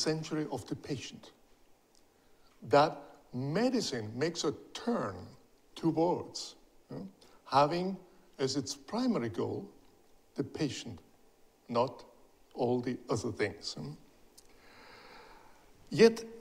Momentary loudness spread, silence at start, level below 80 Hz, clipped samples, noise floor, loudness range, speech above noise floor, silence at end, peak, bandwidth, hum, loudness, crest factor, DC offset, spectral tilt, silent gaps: 25 LU; 0 s; -68 dBFS; under 0.1%; -65 dBFS; 5 LU; 33 dB; 0 s; -10 dBFS; 15.5 kHz; none; -33 LUFS; 26 dB; under 0.1%; -5 dB/octave; none